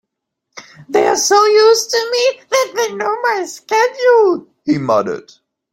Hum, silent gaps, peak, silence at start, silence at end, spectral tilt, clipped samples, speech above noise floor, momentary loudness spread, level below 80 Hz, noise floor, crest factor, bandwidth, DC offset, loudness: none; none; -2 dBFS; 0.55 s; 0.5 s; -2.5 dB/octave; under 0.1%; 62 dB; 9 LU; -62 dBFS; -76 dBFS; 14 dB; 16.5 kHz; under 0.1%; -14 LUFS